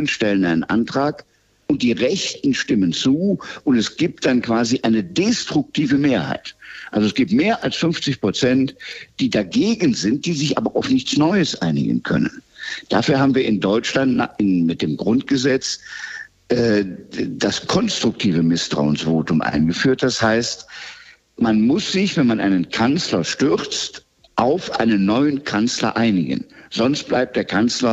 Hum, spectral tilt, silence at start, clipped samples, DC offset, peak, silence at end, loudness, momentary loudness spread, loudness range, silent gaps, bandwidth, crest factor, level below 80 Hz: none; -5 dB/octave; 0 s; under 0.1%; under 0.1%; -4 dBFS; 0 s; -19 LUFS; 8 LU; 1 LU; none; 8.2 kHz; 14 dB; -52 dBFS